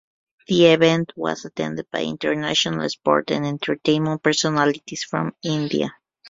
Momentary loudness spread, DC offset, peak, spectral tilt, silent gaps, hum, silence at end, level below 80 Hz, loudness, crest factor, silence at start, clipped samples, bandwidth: 11 LU; under 0.1%; -2 dBFS; -4.5 dB/octave; none; none; 0 s; -60 dBFS; -21 LUFS; 20 dB; 0.5 s; under 0.1%; 7.8 kHz